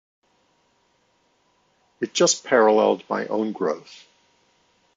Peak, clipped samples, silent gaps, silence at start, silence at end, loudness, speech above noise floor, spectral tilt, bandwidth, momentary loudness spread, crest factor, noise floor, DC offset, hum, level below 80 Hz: -4 dBFS; under 0.1%; none; 2 s; 1 s; -21 LUFS; 45 dB; -3 dB/octave; 7.8 kHz; 10 LU; 20 dB; -66 dBFS; under 0.1%; none; -74 dBFS